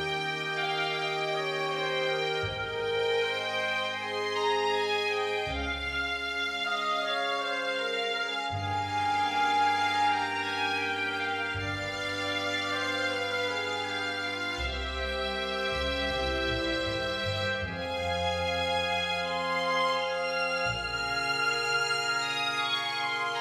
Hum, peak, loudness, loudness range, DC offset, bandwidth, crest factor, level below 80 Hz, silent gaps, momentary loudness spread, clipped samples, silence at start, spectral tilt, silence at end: none; -16 dBFS; -29 LUFS; 2 LU; under 0.1%; 15 kHz; 14 dB; -48 dBFS; none; 4 LU; under 0.1%; 0 s; -3.5 dB/octave; 0 s